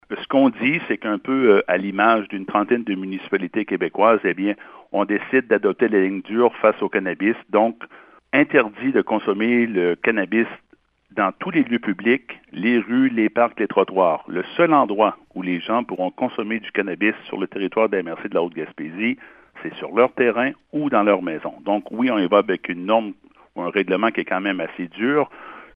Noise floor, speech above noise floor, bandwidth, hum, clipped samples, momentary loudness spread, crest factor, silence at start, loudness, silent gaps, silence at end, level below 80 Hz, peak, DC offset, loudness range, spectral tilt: -55 dBFS; 35 dB; 5 kHz; none; under 0.1%; 10 LU; 20 dB; 0.1 s; -20 LUFS; none; 0.1 s; -68 dBFS; 0 dBFS; under 0.1%; 4 LU; -9 dB/octave